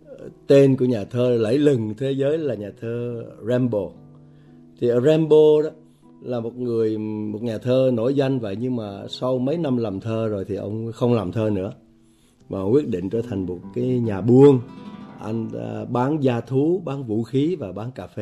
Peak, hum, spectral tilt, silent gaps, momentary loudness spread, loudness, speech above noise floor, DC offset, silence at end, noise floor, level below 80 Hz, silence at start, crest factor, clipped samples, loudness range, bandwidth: -4 dBFS; none; -8.5 dB/octave; none; 15 LU; -21 LUFS; 35 dB; under 0.1%; 0 s; -55 dBFS; -60 dBFS; 0.1 s; 18 dB; under 0.1%; 4 LU; 11.5 kHz